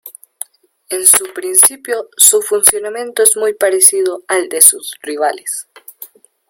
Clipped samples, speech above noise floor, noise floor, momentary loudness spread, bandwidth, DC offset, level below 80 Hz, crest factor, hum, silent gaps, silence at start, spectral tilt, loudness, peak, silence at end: 0.8%; 25 dB; -38 dBFS; 16 LU; over 20 kHz; under 0.1%; -58 dBFS; 14 dB; none; none; 0.05 s; 0.5 dB/octave; -10 LUFS; 0 dBFS; 0.45 s